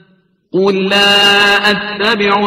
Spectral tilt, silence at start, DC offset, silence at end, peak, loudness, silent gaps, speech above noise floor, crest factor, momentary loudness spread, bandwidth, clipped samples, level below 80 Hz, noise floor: -3.5 dB/octave; 0.55 s; under 0.1%; 0 s; 0 dBFS; -10 LUFS; none; 42 dB; 12 dB; 7 LU; 16 kHz; under 0.1%; -50 dBFS; -53 dBFS